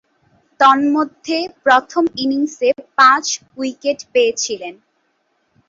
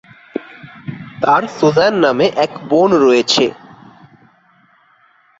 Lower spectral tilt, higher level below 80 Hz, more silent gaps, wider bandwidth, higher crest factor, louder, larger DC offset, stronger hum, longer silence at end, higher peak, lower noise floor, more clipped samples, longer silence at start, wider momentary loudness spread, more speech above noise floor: second, -1.5 dB/octave vs -4.5 dB/octave; second, -64 dBFS vs -58 dBFS; neither; about the same, 7.8 kHz vs 8 kHz; about the same, 16 dB vs 16 dB; second, -16 LUFS vs -13 LUFS; neither; neither; second, 0.95 s vs 1.9 s; about the same, 0 dBFS vs 0 dBFS; first, -65 dBFS vs -53 dBFS; neither; first, 0.6 s vs 0.35 s; second, 11 LU vs 18 LU; first, 49 dB vs 40 dB